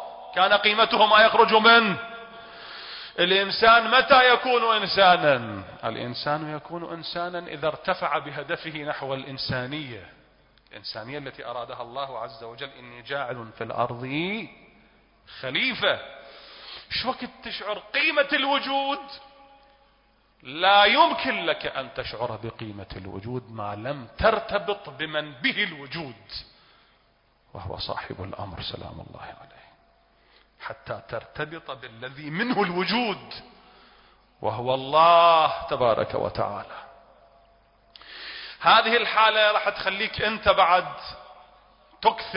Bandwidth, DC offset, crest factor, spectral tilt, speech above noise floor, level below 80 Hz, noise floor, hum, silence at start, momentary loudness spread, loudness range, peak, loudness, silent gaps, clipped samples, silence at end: 5.6 kHz; under 0.1%; 20 dB; -8 dB/octave; 40 dB; -54 dBFS; -63 dBFS; none; 0 s; 22 LU; 17 LU; -4 dBFS; -22 LUFS; none; under 0.1%; 0 s